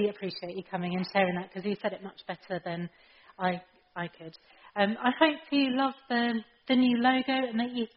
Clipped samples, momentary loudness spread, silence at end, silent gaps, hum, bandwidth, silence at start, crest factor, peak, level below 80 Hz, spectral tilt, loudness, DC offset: under 0.1%; 15 LU; 0.1 s; none; none; 5.8 kHz; 0 s; 22 dB; -8 dBFS; -72 dBFS; -3.5 dB/octave; -30 LUFS; under 0.1%